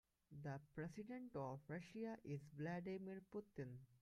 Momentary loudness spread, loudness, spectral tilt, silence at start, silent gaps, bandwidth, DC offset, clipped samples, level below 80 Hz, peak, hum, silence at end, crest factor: 6 LU; -53 LUFS; -8 dB/octave; 0.3 s; none; 13.5 kHz; under 0.1%; under 0.1%; -80 dBFS; -36 dBFS; none; 0.05 s; 16 dB